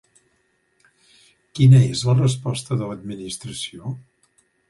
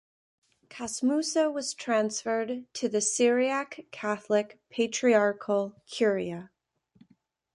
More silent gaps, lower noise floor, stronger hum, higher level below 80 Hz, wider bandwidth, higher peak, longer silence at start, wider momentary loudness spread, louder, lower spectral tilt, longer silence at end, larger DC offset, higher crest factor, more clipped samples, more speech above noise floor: neither; about the same, -66 dBFS vs -67 dBFS; neither; first, -54 dBFS vs -74 dBFS; about the same, 11.5 kHz vs 11.5 kHz; first, -4 dBFS vs -10 dBFS; first, 1.55 s vs 0.7 s; first, 20 LU vs 12 LU; first, -20 LUFS vs -28 LUFS; first, -6.5 dB/octave vs -3.5 dB/octave; second, 0.7 s vs 1.1 s; neither; about the same, 18 dB vs 18 dB; neither; first, 48 dB vs 40 dB